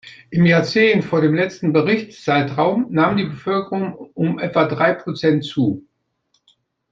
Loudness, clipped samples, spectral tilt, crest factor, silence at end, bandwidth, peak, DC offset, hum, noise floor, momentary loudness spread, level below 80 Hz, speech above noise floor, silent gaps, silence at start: -18 LUFS; under 0.1%; -7 dB/octave; 16 dB; 1.1 s; 7.6 kHz; -2 dBFS; under 0.1%; none; -67 dBFS; 8 LU; -58 dBFS; 49 dB; none; 0.05 s